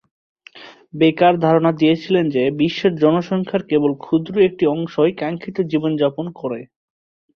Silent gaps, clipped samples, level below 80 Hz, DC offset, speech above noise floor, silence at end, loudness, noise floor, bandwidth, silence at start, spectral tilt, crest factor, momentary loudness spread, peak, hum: none; under 0.1%; -58 dBFS; under 0.1%; 25 dB; 0.75 s; -18 LUFS; -42 dBFS; 6.6 kHz; 0.55 s; -8 dB/octave; 16 dB; 10 LU; -2 dBFS; none